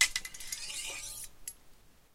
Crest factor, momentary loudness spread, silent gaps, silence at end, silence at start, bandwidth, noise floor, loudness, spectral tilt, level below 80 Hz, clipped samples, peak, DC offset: 30 dB; 11 LU; none; 0.15 s; 0 s; 16.5 kHz; -58 dBFS; -37 LUFS; 2 dB/octave; -56 dBFS; under 0.1%; -8 dBFS; under 0.1%